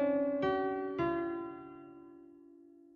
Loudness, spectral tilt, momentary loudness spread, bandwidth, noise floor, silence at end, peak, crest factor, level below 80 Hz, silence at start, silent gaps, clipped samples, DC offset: -35 LUFS; -5 dB/octave; 22 LU; 6.4 kHz; -58 dBFS; 0.3 s; -20 dBFS; 16 dB; -66 dBFS; 0 s; none; under 0.1%; under 0.1%